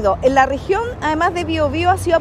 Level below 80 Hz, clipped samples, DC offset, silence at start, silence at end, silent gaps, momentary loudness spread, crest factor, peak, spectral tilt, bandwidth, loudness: -34 dBFS; under 0.1%; under 0.1%; 0 s; 0 s; none; 5 LU; 16 dB; 0 dBFS; -5.5 dB/octave; 14 kHz; -17 LUFS